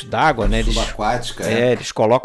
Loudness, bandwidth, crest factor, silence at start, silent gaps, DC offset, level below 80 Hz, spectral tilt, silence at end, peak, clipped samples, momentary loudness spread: -19 LUFS; 12.5 kHz; 14 dB; 0 s; none; under 0.1%; -26 dBFS; -4.5 dB/octave; 0 s; -4 dBFS; under 0.1%; 5 LU